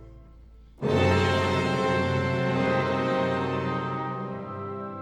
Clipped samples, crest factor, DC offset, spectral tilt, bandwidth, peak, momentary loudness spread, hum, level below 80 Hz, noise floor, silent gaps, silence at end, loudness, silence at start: under 0.1%; 16 dB; under 0.1%; -6.5 dB/octave; 11.5 kHz; -10 dBFS; 12 LU; none; -54 dBFS; -49 dBFS; none; 0 s; -26 LUFS; 0 s